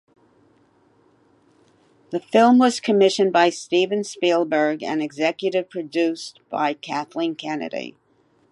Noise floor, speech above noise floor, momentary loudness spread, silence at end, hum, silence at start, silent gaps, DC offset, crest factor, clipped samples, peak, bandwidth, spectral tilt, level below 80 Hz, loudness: -61 dBFS; 41 dB; 14 LU; 0.6 s; none; 2.1 s; none; under 0.1%; 20 dB; under 0.1%; -2 dBFS; 11.5 kHz; -4.5 dB/octave; -76 dBFS; -21 LUFS